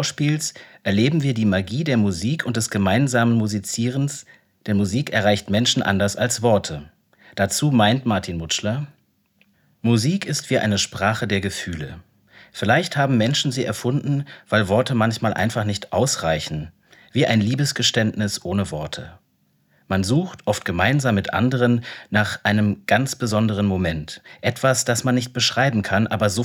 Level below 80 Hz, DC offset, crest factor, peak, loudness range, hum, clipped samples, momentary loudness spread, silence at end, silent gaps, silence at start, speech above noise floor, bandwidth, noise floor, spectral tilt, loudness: -54 dBFS; under 0.1%; 18 dB; -2 dBFS; 3 LU; none; under 0.1%; 9 LU; 0 s; none; 0 s; 44 dB; 17 kHz; -64 dBFS; -5 dB/octave; -21 LUFS